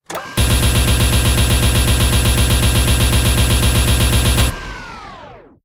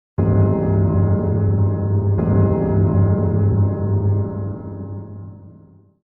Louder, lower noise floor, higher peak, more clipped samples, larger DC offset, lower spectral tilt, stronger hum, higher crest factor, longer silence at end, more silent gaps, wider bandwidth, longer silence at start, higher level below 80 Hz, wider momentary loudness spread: first, -14 LUFS vs -18 LUFS; second, -38 dBFS vs -47 dBFS; first, -2 dBFS vs -6 dBFS; neither; neither; second, -4 dB/octave vs -13.5 dB/octave; neither; about the same, 12 dB vs 12 dB; second, 0.3 s vs 0.55 s; neither; first, 17.5 kHz vs 2.2 kHz; about the same, 0.1 s vs 0.2 s; first, -18 dBFS vs -38 dBFS; about the same, 15 LU vs 14 LU